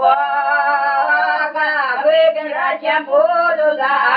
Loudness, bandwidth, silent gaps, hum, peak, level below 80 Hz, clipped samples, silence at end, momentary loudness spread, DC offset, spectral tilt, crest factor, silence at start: -15 LUFS; 5.2 kHz; none; none; -2 dBFS; -76 dBFS; under 0.1%; 0 s; 4 LU; under 0.1%; -5.5 dB/octave; 14 dB; 0 s